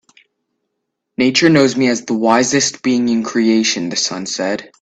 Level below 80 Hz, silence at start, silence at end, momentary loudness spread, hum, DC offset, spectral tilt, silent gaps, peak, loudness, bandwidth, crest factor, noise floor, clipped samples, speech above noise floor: -58 dBFS; 1.2 s; 0.15 s; 8 LU; none; under 0.1%; -3.5 dB/octave; none; 0 dBFS; -15 LUFS; 9 kHz; 16 dB; -74 dBFS; under 0.1%; 60 dB